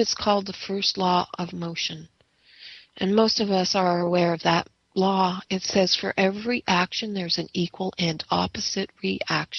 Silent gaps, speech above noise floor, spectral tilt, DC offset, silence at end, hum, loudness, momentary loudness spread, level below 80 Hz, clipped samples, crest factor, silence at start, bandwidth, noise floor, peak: none; 28 dB; -4.5 dB/octave; under 0.1%; 0 s; none; -24 LUFS; 9 LU; -58 dBFS; under 0.1%; 20 dB; 0 s; 7 kHz; -53 dBFS; -4 dBFS